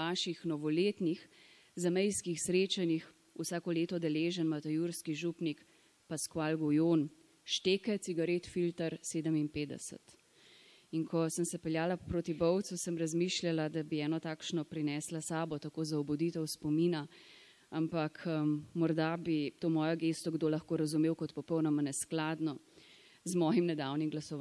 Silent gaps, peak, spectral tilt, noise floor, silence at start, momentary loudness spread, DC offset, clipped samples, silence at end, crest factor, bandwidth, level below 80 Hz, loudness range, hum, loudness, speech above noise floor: none; -20 dBFS; -5 dB/octave; -63 dBFS; 0 s; 8 LU; under 0.1%; under 0.1%; 0 s; 16 dB; 12 kHz; -70 dBFS; 3 LU; none; -35 LUFS; 28 dB